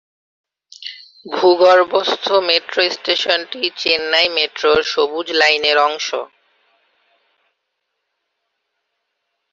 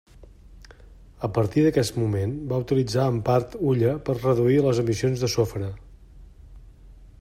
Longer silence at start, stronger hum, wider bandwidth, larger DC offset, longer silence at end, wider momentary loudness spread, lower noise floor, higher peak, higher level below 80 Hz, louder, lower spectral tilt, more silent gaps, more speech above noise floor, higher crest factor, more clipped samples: first, 0.8 s vs 0.2 s; neither; second, 7.8 kHz vs 16 kHz; neither; first, 3.25 s vs 0.15 s; first, 16 LU vs 8 LU; first, -74 dBFS vs -48 dBFS; first, 0 dBFS vs -6 dBFS; second, -60 dBFS vs -48 dBFS; first, -15 LUFS vs -23 LUFS; second, -2 dB/octave vs -7 dB/octave; neither; first, 58 dB vs 25 dB; about the same, 18 dB vs 18 dB; neither